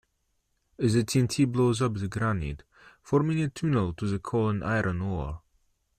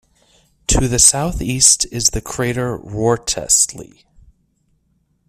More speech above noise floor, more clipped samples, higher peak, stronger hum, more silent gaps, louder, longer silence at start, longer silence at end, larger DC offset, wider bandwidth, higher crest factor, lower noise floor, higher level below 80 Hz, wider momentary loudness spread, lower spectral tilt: about the same, 48 dB vs 46 dB; neither; second, -10 dBFS vs 0 dBFS; neither; neither; second, -27 LUFS vs -14 LUFS; about the same, 0.8 s vs 0.7 s; second, 0.6 s vs 1.45 s; neither; second, 14.5 kHz vs 16 kHz; about the same, 18 dB vs 18 dB; first, -75 dBFS vs -63 dBFS; second, -48 dBFS vs -32 dBFS; second, 9 LU vs 12 LU; first, -6.5 dB/octave vs -2.5 dB/octave